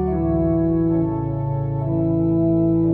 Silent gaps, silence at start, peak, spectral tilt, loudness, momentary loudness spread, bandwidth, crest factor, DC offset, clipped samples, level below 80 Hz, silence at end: none; 0 s; -8 dBFS; -14 dB/octave; -20 LUFS; 6 LU; 2.5 kHz; 10 dB; under 0.1%; under 0.1%; -34 dBFS; 0 s